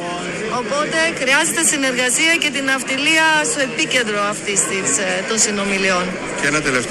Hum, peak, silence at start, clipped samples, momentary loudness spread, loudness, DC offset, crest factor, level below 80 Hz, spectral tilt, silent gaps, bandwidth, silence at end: none; -2 dBFS; 0 s; under 0.1%; 7 LU; -16 LUFS; under 0.1%; 16 dB; -50 dBFS; -1.5 dB/octave; none; 13 kHz; 0 s